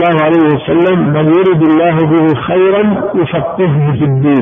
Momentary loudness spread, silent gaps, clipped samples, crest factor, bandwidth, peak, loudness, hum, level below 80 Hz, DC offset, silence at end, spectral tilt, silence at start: 5 LU; none; under 0.1%; 8 dB; 3.7 kHz; 0 dBFS; -10 LUFS; none; -44 dBFS; under 0.1%; 0 s; -10.5 dB/octave; 0 s